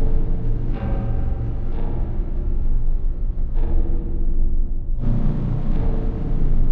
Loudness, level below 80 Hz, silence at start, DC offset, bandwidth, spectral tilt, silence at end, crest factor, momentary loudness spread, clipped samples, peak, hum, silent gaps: -26 LUFS; -18 dBFS; 0 s; under 0.1%; 2.2 kHz; -11 dB/octave; 0 s; 10 dB; 4 LU; under 0.1%; -8 dBFS; none; none